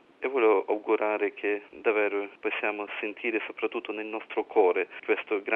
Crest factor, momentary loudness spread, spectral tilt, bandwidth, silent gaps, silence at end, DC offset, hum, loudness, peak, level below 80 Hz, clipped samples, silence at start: 18 dB; 9 LU; -6 dB/octave; 3.9 kHz; none; 0 s; under 0.1%; none; -28 LUFS; -10 dBFS; -80 dBFS; under 0.1%; 0.2 s